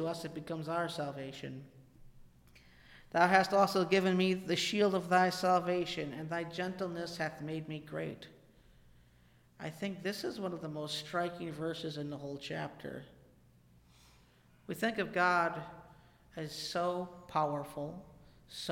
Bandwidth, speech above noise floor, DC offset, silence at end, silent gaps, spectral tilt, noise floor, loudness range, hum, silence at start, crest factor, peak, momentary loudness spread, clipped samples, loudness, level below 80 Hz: 16.5 kHz; 30 dB; under 0.1%; 0 s; none; -5 dB/octave; -65 dBFS; 12 LU; none; 0 s; 24 dB; -12 dBFS; 17 LU; under 0.1%; -34 LUFS; -68 dBFS